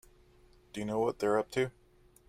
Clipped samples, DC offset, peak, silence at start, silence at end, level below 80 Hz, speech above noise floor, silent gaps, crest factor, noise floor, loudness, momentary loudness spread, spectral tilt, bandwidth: under 0.1%; under 0.1%; -16 dBFS; 0.75 s; 0.6 s; -64 dBFS; 30 dB; none; 18 dB; -62 dBFS; -33 LUFS; 10 LU; -5.5 dB/octave; 15.5 kHz